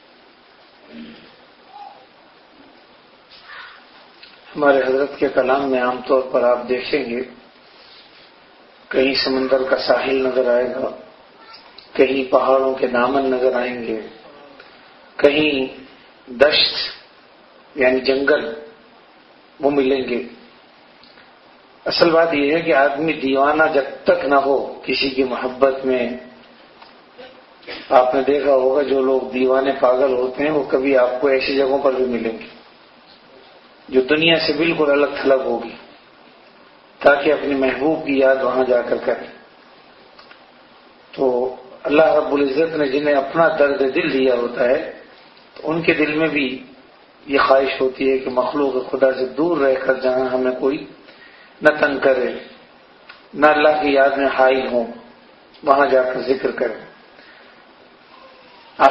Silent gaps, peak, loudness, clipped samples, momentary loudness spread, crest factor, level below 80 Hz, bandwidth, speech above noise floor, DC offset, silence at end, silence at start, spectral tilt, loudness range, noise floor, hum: none; 0 dBFS; -17 LUFS; under 0.1%; 13 LU; 20 dB; -56 dBFS; 6 kHz; 32 dB; under 0.1%; 0 s; 0.9 s; -6.5 dB/octave; 5 LU; -49 dBFS; none